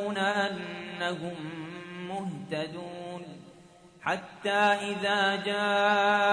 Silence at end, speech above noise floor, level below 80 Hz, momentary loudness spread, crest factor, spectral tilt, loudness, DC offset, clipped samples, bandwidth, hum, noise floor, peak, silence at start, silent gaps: 0 s; 26 dB; -72 dBFS; 16 LU; 18 dB; -4.5 dB/octave; -29 LUFS; under 0.1%; under 0.1%; 10.5 kHz; none; -54 dBFS; -12 dBFS; 0 s; none